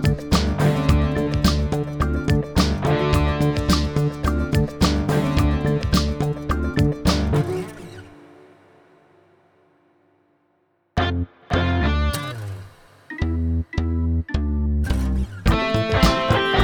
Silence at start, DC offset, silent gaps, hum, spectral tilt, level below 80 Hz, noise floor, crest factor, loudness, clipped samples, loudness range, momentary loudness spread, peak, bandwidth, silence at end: 0 s; under 0.1%; none; none; -6 dB/octave; -26 dBFS; -66 dBFS; 18 dB; -21 LUFS; under 0.1%; 8 LU; 8 LU; -2 dBFS; over 20 kHz; 0 s